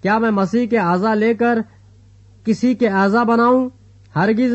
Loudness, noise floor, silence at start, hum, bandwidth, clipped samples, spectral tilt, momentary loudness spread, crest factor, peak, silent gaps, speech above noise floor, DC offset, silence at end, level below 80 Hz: -17 LUFS; -46 dBFS; 0.05 s; none; 8.2 kHz; under 0.1%; -7.5 dB/octave; 10 LU; 12 dB; -6 dBFS; none; 31 dB; under 0.1%; 0 s; -56 dBFS